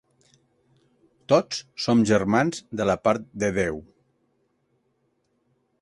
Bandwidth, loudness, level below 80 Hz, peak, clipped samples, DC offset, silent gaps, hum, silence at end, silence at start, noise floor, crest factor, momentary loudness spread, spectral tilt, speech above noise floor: 11.5 kHz; -23 LUFS; -54 dBFS; -6 dBFS; under 0.1%; under 0.1%; none; none; 2 s; 1.3 s; -71 dBFS; 22 dB; 9 LU; -5.5 dB/octave; 48 dB